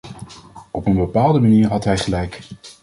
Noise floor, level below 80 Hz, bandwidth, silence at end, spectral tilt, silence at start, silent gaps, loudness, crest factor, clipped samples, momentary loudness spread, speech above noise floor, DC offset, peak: -41 dBFS; -38 dBFS; 11.5 kHz; 0.1 s; -7 dB/octave; 0.05 s; none; -17 LUFS; 16 dB; under 0.1%; 23 LU; 24 dB; under 0.1%; -2 dBFS